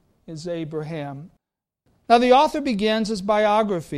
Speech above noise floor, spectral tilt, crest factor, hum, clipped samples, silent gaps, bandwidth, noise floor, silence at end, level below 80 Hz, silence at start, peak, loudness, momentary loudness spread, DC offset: 53 dB; -5.5 dB/octave; 20 dB; none; under 0.1%; none; 13.5 kHz; -73 dBFS; 0 s; -54 dBFS; 0.3 s; -2 dBFS; -20 LUFS; 19 LU; under 0.1%